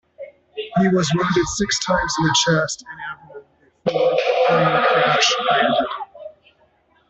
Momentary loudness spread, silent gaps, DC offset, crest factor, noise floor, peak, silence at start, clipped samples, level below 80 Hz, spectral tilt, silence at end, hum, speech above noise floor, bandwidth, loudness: 16 LU; none; under 0.1%; 16 dB; -59 dBFS; -4 dBFS; 0.2 s; under 0.1%; -48 dBFS; -4 dB/octave; 0.8 s; none; 40 dB; 8.4 kHz; -18 LUFS